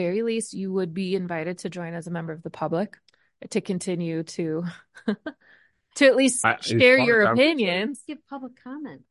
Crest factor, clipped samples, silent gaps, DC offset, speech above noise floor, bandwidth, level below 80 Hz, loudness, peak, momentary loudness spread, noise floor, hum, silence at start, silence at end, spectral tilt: 20 dB; under 0.1%; none; under 0.1%; 35 dB; 11.5 kHz; -66 dBFS; -23 LUFS; -4 dBFS; 20 LU; -59 dBFS; none; 0 s; 0.1 s; -4.5 dB/octave